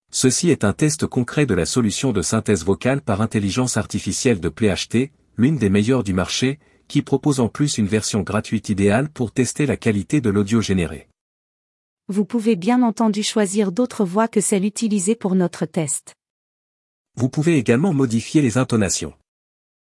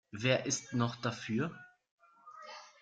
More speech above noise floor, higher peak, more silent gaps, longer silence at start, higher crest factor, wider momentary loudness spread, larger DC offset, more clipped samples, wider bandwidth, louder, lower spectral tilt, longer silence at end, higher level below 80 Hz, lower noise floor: first, over 71 dB vs 20 dB; first, -2 dBFS vs -16 dBFS; first, 11.21-11.97 s, 16.30-17.05 s vs 1.91-1.98 s; about the same, 0.15 s vs 0.15 s; about the same, 18 dB vs 20 dB; second, 6 LU vs 20 LU; neither; neither; first, 12 kHz vs 9.6 kHz; first, -20 LUFS vs -35 LUFS; about the same, -5 dB/octave vs -4.5 dB/octave; first, 0.85 s vs 0.1 s; first, -52 dBFS vs -72 dBFS; first, under -90 dBFS vs -55 dBFS